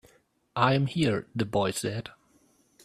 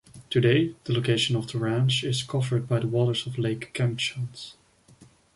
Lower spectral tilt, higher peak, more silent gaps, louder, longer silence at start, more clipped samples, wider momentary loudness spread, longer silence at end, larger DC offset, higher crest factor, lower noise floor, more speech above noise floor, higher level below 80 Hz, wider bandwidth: about the same, -5.5 dB/octave vs -5.5 dB/octave; about the same, -8 dBFS vs -8 dBFS; neither; about the same, -28 LUFS vs -26 LUFS; first, 0.55 s vs 0.15 s; neither; first, 13 LU vs 7 LU; about the same, 0.75 s vs 0.85 s; neither; about the same, 22 dB vs 18 dB; first, -65 dBFS vs -55 dBFS; first, 38 dB vs 30 dB; about the same, -60 dBFS vs -60 dBFS; first, 14 kHz vs 11.5 kHz